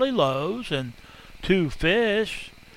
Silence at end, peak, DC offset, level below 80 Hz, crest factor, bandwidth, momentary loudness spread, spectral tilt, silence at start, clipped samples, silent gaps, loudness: 0.15 s; -8 dBFS; under 0.1%; -44 dBFS; 18 dB; 16 kHz; 13 LU; -5.5 dB/octave; 0 s; under 0.1%; none; -24 LUFS